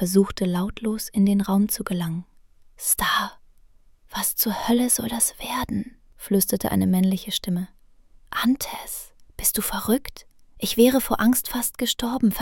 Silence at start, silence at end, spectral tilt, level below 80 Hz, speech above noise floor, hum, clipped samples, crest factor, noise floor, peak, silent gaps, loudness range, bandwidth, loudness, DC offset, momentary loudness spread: 0 s; 0 s; -4 dB/octave; -46 dBFS; 30 dB; none; under 0.1%; 20 dB; -53 dBFS; -4 dBFS; none; 3 LU; 17.5 kHz; -23 LUFS; under 0.1%; 12 LU